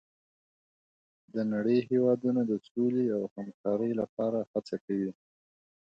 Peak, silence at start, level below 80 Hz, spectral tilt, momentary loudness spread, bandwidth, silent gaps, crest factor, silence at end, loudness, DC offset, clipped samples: -14 dBFS; 1.35 s; -76 dBFS; -9 dB/octave; 9 LU; 7.6 kHz; 2.71-2.75 s, 3.31-3.36 s, 3.54-3.64 s, 4.09-4.17 s, 4.47-4.54 s, 4.81-4.88 s; 16 dB; 0.8 s; -31 LUFS; under 0.1%; under 0.1%